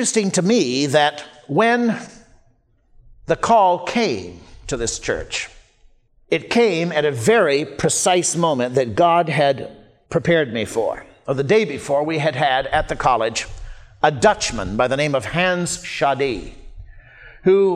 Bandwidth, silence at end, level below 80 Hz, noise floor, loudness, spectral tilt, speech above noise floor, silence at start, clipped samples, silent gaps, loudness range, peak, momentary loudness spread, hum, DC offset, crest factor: 15 kHz; 0 s; -42 dBFS; -58 dBFS; -19 LUFS; -4 dB/octave; 40 dB; 0 s; under 0.1%; none; 4 LU; -2 dBFS; 10 LU; none; under 0.1%; 18 dB